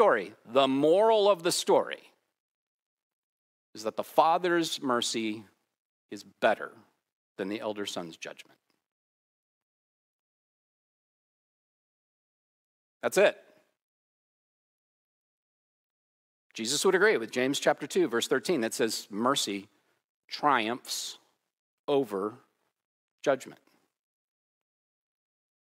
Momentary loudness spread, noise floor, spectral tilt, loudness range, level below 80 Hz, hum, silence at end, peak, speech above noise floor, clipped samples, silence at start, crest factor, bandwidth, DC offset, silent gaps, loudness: 17 LU; under -90 dBFS; -3 dB/octave; 12 LU; under -90 dBFS; none; 2.05 s; -8 dBFS; over 62 dB; under 0.1%; 0 s; 24 dB; 16 kHz; under 0.1%; 2.40-3.73 s, 5.78-6.09 s, 7.12-7.36 s, 8.86-13.00 s, 13.82-16.50 s, 20.04-20.23 s, 21.59-21.88 s, 22.85-23.18 s; -28 LUFS